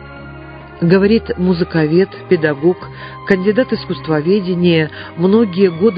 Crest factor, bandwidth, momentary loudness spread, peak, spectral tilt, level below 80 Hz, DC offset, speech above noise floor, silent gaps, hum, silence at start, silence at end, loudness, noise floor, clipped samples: 14 dB; 5.2 kHz; 17 LU; 0 dBFS; -9.5 dB/octave; -42 dBFS; under 0.1%; 19 dB; none; none; 0 s; 0 s; -15 LUFS; -33 dBFS; under 0.1%